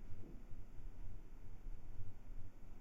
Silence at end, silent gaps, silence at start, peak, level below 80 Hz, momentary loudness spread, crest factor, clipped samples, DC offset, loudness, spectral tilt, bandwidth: 0 s; none; 0 s; -30 dBFS; -52 dBFS; 3 LU; 12 dB; under 0.1%; under 0.1%; -59 LUFS; -7.5 dB/octave; 3 kHz